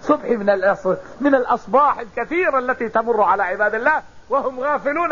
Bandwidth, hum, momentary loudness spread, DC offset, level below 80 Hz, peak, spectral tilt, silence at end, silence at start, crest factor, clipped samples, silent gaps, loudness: 7.4 kHz; none; 6 LU; 0.6%; -52 dBFS; -4 dBFS; -6.5 dB/octave; 0 s; 0 s; 16 dB; under 0.1%; none; -19 LUFS